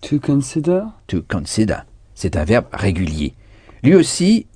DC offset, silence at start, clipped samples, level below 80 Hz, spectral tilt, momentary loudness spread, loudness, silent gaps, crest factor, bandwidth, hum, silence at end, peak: under 0.1%; 0 s; under 0.1%; -34 dBFS; -6 dB/octave; 12 LU; -18 LUFS; none; 18 dB; 10 kHz; none; 0.15 s; 0 dBFS